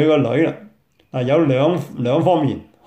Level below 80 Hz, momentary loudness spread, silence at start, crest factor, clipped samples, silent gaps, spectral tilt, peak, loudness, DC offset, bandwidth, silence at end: -58 dBFS; 9 LU; 0 s; 14 dB; under 0.1%; none; -8 dB/octave; -4 dBFS; -18 LUFS; under 0.1%; 8.8 kHz; 0.25 s